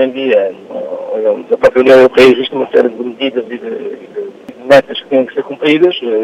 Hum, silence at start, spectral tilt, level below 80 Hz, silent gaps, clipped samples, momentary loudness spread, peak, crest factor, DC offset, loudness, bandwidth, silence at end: none; 0 s; -5.5 dB/octave; -50 dBFS; none; 0.4%; 17 LU; 0 dBFS; 12 dB; under 0.1%; -11 LUFS; 12 kHz; 0 s